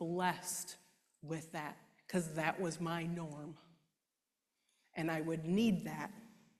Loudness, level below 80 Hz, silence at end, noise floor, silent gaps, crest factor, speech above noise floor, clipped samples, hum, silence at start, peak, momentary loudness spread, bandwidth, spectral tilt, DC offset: -39 LUFS; -74 dBFS; 0.3 s; -90 dBFS; none; 22 dB; 51 dB; under 0.1%; none; 0 s; -18 dBFS; 18 LU; 14 kHz; -5 dB/octave; under 0.1%